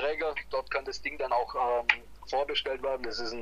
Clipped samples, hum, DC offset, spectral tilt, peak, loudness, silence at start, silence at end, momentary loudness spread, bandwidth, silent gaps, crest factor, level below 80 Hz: under 0.1%; none; under 0.1%; -2.5 dB/octave; -4 dBFS; -31 LUFS; 0 s; 0 s; 7 LU; 15 kHz; none; 28 dB; -54 dBFS